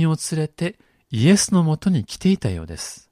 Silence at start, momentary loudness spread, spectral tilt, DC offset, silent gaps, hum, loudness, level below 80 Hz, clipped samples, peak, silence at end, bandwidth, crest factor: 0 s; 14 LU; -5.5 dB/octave; under 0.1%; none; none; -20 LUFS; -46 dBFS; under 0.1%; -4 dBFS; 0.15 s; 14.5 kHz; 16 dB